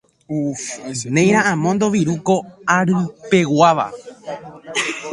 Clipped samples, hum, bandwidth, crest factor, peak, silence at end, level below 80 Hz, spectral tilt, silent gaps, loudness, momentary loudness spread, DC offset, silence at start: under 0.1%; none; 11.5 kHz; 18 dB; 0 dBFS; 0 s; -58 dBFS; -5 dB/octave; none; -18 LUFS; 14 LU; under 0.1%; 0.3 s